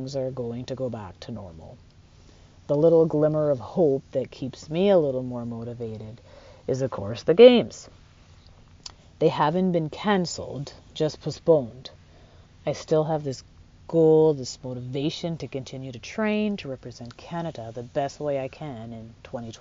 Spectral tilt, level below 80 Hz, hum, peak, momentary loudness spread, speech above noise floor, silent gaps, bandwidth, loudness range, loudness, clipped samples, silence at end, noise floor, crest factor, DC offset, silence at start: -6 dB/octave; -56 dBFS; none; -2 dBFS; 19 LU; 28 dB; none; 7.4 kHz; 9 LU; -24 LUFS; under 0.1%; 0.05 s; -52 dBFS; 24 dB; under 0.1%; 0 s